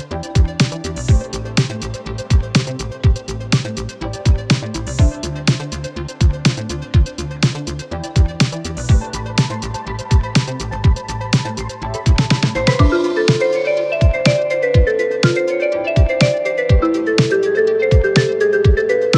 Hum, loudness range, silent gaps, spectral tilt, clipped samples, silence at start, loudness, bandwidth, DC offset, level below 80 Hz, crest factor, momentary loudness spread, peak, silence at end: none; 4 LU; none; -6 dB/octave; under 0.1%; 0 s; -17 LUFS; 10.5 kHz; under 0.1%; -22 dBFS; 16 dB; 10 LU; 0 dBFS; 0 s